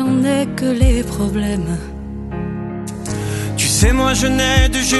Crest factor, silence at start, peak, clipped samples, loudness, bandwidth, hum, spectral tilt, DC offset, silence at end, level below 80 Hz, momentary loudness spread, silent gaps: 16 dB; 0 s; -2 dBFS; under 0.1%; -17 LUFS; 12.5 kHz; none; -4.5 dB/octave; under 0.1%; 0 s; -22 dBFS; 12 LU; none